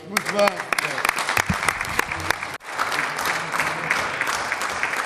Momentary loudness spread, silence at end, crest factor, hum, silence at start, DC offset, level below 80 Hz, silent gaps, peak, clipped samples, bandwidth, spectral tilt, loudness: 4 LU; 0 s; 20 dB; none; 0 s; under 0.1%; -50 dBFS; none; -4 dBFS; under 0.1%; 15.5 kHz; -2.5 dB/octave; -23 LUFS